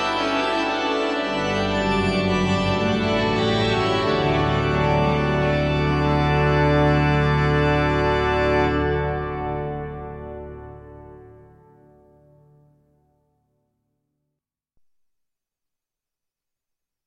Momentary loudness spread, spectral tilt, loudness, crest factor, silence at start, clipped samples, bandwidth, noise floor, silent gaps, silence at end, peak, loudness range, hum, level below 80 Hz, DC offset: 12 LU; -6.5 dB/octave; -21 LUFS; 16 dB; 0 s; under 0.1%; 10 kHz; -86 dBFS; none; 5.75 s; -6 dBFS; 13 LU; none; -36 dBFS; under 0.1%